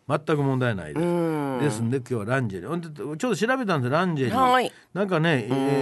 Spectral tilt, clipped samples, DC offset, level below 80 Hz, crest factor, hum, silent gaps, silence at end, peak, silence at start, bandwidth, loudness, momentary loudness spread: -6.5 dB/octave; under 0.1%; under 0.1%; -58 dBFS; 16 dB; none; none; 0 s; -8 dBFS; 0.1 s; 12.5 kHz; -24 LUFS; 8 LU